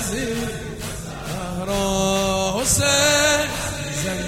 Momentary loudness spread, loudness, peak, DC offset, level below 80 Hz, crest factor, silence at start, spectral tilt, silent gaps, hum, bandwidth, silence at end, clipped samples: 15 LU; -20 LUFS; -4 dBFS; under 0.1%; -38 dBFS; 16 dB; 0 s; -3 dB/octave; none; none; 16.5 kHz; 0 s; under 0.1%